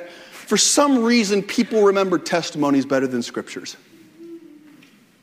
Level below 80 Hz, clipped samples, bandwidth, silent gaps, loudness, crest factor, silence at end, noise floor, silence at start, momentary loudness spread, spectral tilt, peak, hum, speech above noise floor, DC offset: -68 dBFS; under 0.1%; 16 kHz; none; -18 LUFS; 20 dB; 0.85 s; -51 dBFS; 0 s; 18 LU; -3 dB/octave; -2 dBFS; none; 32 dB; under 0.1%